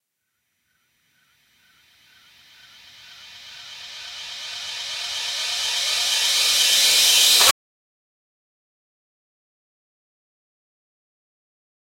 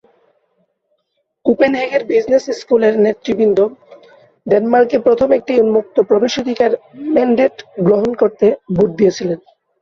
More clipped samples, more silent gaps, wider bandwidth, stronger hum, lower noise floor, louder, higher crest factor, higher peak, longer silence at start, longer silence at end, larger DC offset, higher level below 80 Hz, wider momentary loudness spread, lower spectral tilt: neither; neither; first, 16.5 kHz vs 7.2 kHz; neither; first, -76 dBFS vs -69 dBFS; second, -17 LUFS vs -14 LUFS; first, 26 dB vs 14 dB; about the same, 0 dBFS vs -2 dBFS; first, 3.05 s vs 1.45 s; first, 4.5 s vs 0.45 s; neither; second, -68 dBFS vs -52 dBFS; first, 23 LU vs 5 LU; second, 3 dB/octave vs -6.5 dB/octave